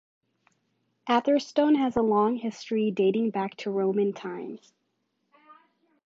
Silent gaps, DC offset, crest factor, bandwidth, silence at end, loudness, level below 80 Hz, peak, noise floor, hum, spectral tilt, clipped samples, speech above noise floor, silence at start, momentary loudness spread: none; under 0.1%; 18 dB; 7.8 kHz; 1.5 s; -26 LUFS; -66 dBFS; -10 dBFS; -76 dBFS; none; -6.5 dB/octave; under 0.1%; 51 dB; 1.05 s; 13 LU